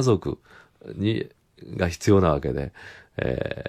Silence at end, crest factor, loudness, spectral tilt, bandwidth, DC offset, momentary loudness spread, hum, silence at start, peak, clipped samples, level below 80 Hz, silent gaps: 0 s; 20 dB; -25 LUFS; -6.5 dB/octave; 15 kHz; under 0.1%; 19 LU; none; 0 s; -6 dBFS; under 0.1%; -44 dBFS; none